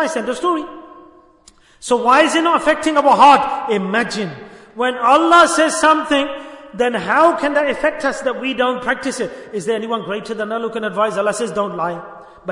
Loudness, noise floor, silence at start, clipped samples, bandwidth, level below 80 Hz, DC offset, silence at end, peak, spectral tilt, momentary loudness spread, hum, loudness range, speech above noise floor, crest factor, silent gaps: -16 LUFS; -49 dBFS; 0 s; under 0.1%; 11 kHz; -54 dBFS; under 0.1%; 0 s; 0 dBFS; -3.5 dB/octave; 15 LU; none; 7 LU; 33 dB; 16 dB; none